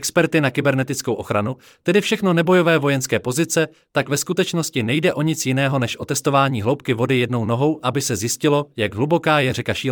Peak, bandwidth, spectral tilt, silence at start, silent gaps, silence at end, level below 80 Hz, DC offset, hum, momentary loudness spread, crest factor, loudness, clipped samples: -4 dBFS; 19 kHz; -5 dB/octave; 0 s; none; 0 s; -60 dBFS; under 0.1%; none; 6 LU; 16 dB; -19 LUFS; under 0.1%